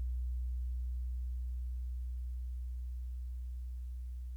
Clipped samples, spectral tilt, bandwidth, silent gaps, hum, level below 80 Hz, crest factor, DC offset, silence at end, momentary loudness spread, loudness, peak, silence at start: under 0.1%; -7 dB/octave; 0.3 kHz; none; none; -40 dBFS; 6 dB; under 0.1%; 0 s; 5 LU; -43 LUFS; -32 dBFS; 0 s